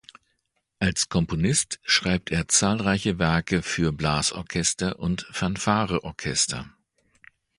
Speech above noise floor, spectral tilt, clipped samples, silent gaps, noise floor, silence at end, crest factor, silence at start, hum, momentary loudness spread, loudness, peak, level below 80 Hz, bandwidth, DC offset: 50 dB; -3.5 dB/octave; under 0.1%; none; -75 dBFS; 0.9 s; 20 dB; 0.8 s; none; 7 LU; -24 LUFS; -6 dBFS; -44 dBFS; 11.5 kHz; under 0.1%